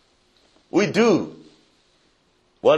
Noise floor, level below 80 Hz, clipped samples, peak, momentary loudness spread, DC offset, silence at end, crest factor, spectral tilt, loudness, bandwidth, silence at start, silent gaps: -63 dBFS; -68 dBFS; under 0.1%; -4 dBFS; 8 LU; under 0.1%; 0 s; 20 dB; -5.5 dB/octave; -20 LUFS; 10.5 kHz; 0.75 s; none